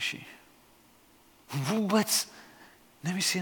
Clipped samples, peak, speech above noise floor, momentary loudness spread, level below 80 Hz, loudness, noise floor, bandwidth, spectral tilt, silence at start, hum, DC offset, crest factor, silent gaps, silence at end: under 0.1%; -12 dBFS; 31 dB; 19 LU; -74 dBFS; -29 LUFS; -60 dBFS; 19 kHz; -3.5 dB/octave; 0 s; none; under 0.1%; 20 dB; none; 0 s